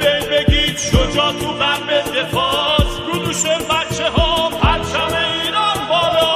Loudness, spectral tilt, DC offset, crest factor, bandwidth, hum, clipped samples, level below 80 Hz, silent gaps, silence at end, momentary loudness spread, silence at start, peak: -16 LUFS; -3.5 dB/octave; under 0.1%; 16 dB; 15.5 kHz; none; under 0.1%; -26 dBFS; none; 0 s; 3 LU; 0 s; 0 dBFS